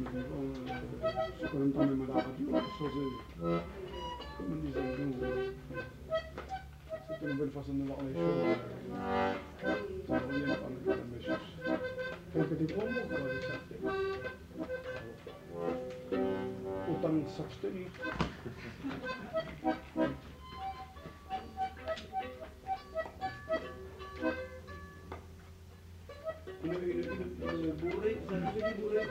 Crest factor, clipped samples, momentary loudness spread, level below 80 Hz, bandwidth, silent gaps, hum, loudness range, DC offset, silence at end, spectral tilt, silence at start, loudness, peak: 20 dB; under 0.1%; 12 LU; -54 dBFS; 16 kHz; none; none; 6 LU; under 0.1%; 0 s; -7 dB/octave; 0 s; -37 LUFS; -18 dBFS